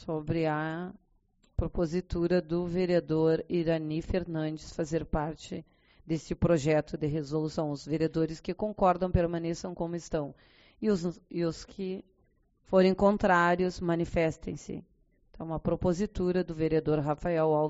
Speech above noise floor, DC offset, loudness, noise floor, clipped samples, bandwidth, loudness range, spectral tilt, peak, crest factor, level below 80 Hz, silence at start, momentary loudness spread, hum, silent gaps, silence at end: 39 dB; under 0.1%; -30 LUFS; -69 dBFS; under 0.1%; 8 kHz; 4 LU; -6.5 dB/octave; -10 dBFS; 20 dB; -46 dBFS; 0 s; 13 LU; none; none; 0 s